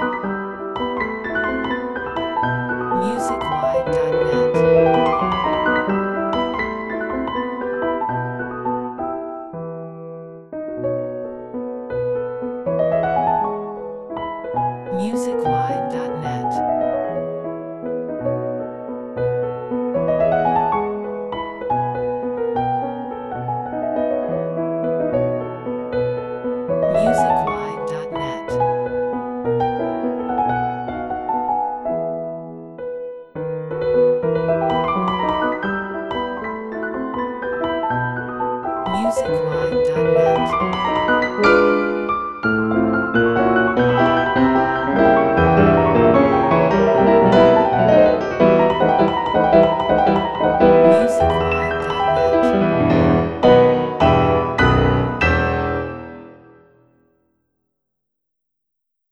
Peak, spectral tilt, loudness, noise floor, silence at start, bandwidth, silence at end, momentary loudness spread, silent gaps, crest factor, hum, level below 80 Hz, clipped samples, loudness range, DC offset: 0 dBFS; -7 dB/octave; -19 LUFS; -79 dBFS; 0 s; 11.5 kHz; 2.75 s; 13 LU; none; 18 dB; none; -40 dBFS; under 0.1%; 10 LU; under 0.1%